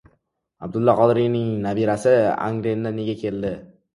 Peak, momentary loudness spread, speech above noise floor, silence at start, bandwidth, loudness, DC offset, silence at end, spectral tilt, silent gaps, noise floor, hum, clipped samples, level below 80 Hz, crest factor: -2 dBFS; 12 LU; 48 dB; 0.6 s; 11.5 kHz; -21 LUFS; under 0.1%; 0.3 s; -7.5 dB/octave; none; -68 dBFS; none; under 0.1%; -54 dBFS; 18 dB